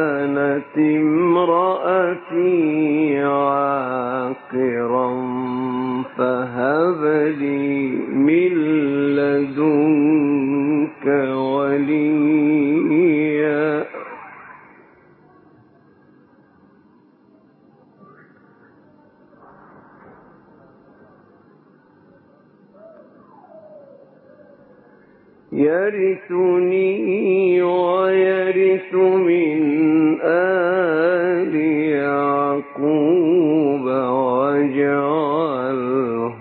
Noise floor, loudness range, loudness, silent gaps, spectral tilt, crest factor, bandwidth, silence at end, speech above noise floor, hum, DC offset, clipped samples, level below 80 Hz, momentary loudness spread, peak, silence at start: -53 dBFS; 5 LU; -18 LUFS; none; -12 dB/octave; 14 dB; 4.4 kHz; 0 s; 36 dB; none; under 0.1%; under 0.1%; -68 dBFS; 6 LU; -4 dBFS; 0 s